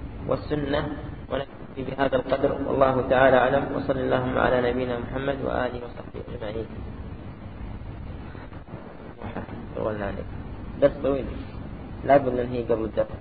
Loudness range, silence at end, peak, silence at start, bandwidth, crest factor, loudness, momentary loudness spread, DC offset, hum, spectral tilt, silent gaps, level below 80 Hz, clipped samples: 15 LU; 0 s; -4 dBFS; 0 s; 4.8 kHz; 22 dB; -25 LUFS; 18 LU; 0.4%; none; -11 dB/octave; none; -42 dBFS; under 0.1%